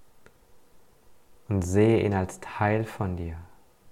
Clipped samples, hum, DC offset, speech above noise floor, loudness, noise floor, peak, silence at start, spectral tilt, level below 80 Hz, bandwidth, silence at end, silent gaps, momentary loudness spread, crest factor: under 0.1%; none; under 0.1%; 29 dB; -26 LUFS; -54 dBFS; -10 dBFS; 0 s; -7 dB/octave; -50 dBFS; 14 kHz; 0 s; none; 14 LU; 18 dB